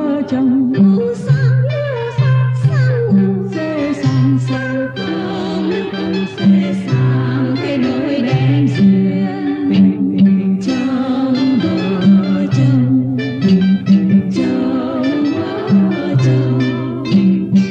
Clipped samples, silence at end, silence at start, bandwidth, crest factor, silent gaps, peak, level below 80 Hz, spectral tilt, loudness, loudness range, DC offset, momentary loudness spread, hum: under 0.1%; 0 s; 0 s; 7.6 kHz; 12 dB; none; -2 dBFS; -52 dBFS; -8.5 dB/octave; -14 LUFS; 3 LU; under 0.1%; 7 LU; none